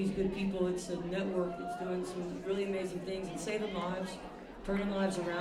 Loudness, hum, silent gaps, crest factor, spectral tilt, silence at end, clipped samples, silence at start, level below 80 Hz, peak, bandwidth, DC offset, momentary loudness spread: -36 LUFS; none; none; 14 dB; -6 dB/octave; 0 s; under 0.1%; 0 s; -56 dBFS; -20 dBFS; 13 kHz; under 0.1%; 6 LU